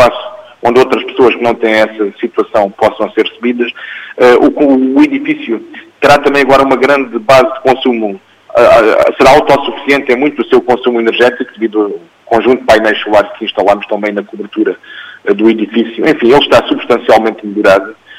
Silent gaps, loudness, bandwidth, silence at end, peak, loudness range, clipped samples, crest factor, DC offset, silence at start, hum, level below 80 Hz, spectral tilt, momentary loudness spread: none; -9 LUFS; 16 kHz; 0.05 s; 0 dBFS; 3 LU; 0.6%; 10 dB; under 0.1%; 0 s; none; -42 dBFS; -5 dB/octave; 10 LU